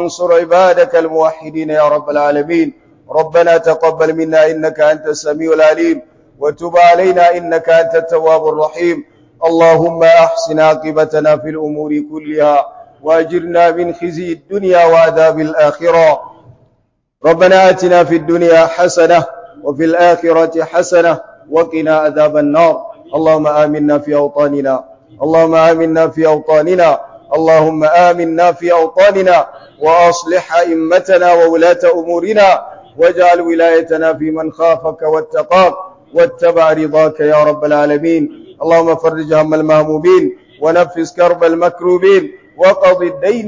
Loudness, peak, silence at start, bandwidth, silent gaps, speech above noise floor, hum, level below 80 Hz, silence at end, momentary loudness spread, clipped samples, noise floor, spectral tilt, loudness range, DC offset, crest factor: -11 LUFS; 0 dBFS; 0 s; 7.6 kHz; none; 50 dB; none; -52 dBFS; 0 s; 9 LU; under 0.1%; -60 dBFS; -5.5 dB/octave; 2 LU; under 0.1%; 10 dB